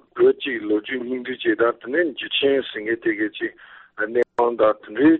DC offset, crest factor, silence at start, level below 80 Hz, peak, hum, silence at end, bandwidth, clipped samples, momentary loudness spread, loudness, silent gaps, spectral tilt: under 0.1%; 14 dB; 0.15 s; -64 dBFS; -6 dBFS; none; 0 s; 4.2 kHz; under 0.1%; 9 LU; -22 LUFS; none; -2 dB/octave